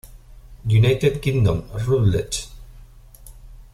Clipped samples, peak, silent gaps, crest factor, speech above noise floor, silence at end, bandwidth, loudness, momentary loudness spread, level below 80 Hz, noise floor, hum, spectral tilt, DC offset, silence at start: under 0.1%; -6 dBFS; none; 16 dB; 25 dB; 0.1 s; 14 kHz; -20 LUFS; 11 LU; -38 dBFS; -44 dBFS; none; -6 dB/octave; under 0.1%; 0.05 s